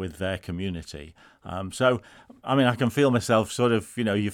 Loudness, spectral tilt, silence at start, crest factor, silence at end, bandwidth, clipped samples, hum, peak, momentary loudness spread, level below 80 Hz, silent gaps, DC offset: -25 LUFS; -5.5 dB/octave; 0 s; 20 dB; 0 s; 17 kHz; under 0.1%; none; -6 dBFS; 16 LU; -56 dBFS; none; under 0.1%